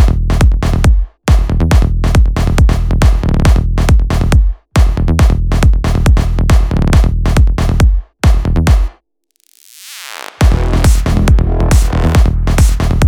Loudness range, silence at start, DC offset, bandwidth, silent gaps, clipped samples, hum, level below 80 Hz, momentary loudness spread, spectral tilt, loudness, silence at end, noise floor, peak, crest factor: 3 LU; 0 s; under 0.1%; 15 kHz; none; under 0.1%; none; -12 dBFS; 2 LU; -6.5 dB/octave; -12 LUFS; 0 s; -59 dBFS; 0 dBFS; 10 dB